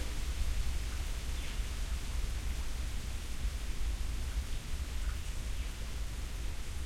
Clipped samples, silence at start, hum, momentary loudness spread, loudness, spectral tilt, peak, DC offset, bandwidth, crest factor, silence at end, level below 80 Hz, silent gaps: under 0.1%; 0 s; none; 3 LU; -40 LUFS; -4 dB/octave; -20 dBFS; under 0.1%; 16 kHz; 14 dB; 0 s; -36 dBFS; none